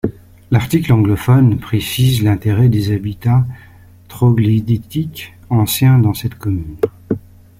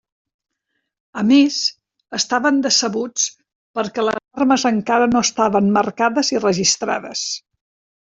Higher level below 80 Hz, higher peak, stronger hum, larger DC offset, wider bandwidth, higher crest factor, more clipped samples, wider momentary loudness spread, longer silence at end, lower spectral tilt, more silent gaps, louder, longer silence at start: first, -40 dBFS vs -58 dBFS; about the same, -2 dBFS vs -2 dBFS; neither; neither; first, 16 kHz vs 8 kHz; about the same, 14 dB vs 16 dB; neither; about the same, 11 LU vs 9 LU; second, 0.4 s vs 0.65 s; first, -7 dB/octave vs -3 dB/octave; second, none vs 3.55-3.74 s; about the same, -15 LUFS vs -17 LUFS; second, 0.05 s vs 1.15 s